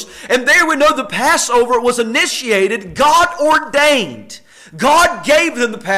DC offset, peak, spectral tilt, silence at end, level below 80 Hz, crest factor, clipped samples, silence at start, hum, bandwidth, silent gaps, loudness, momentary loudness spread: under 0.1%; -4 dBFS; -2 dB/octave; 0 s; -46 dBFS; 10 dB; under 0.1%; 0 s; none; 16 kHz; none; -12 LUFS; 7 LU